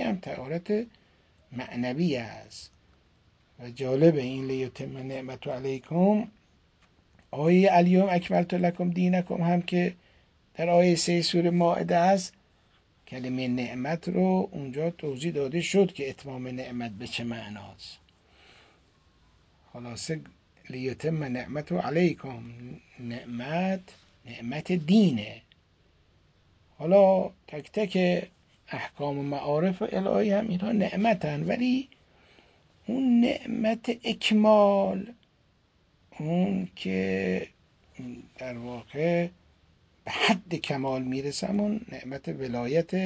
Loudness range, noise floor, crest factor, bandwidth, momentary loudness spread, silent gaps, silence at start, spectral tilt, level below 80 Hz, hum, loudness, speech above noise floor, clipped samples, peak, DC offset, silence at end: 9 LU; -66 dBFS; 20 dB; 8 kHz; 19 LU; none; 0 s; -6.5 dB/octave; -62 dBFS; none; -27 LUFS; 39 dB; under 0.1%; -8 dBFS; under 0.1%; 0 s